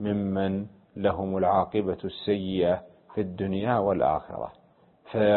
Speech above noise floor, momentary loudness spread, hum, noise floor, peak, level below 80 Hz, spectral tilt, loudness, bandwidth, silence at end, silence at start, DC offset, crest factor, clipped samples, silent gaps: 31 dB; 11 LU; none; -58 dBFS; -10 dBFS; -52 dBFS; -11 dB/octave; -28 LUFS; 4.3 kHz; 0 s; 0 s; under 0.1%; 18 dB; under 0.1%; none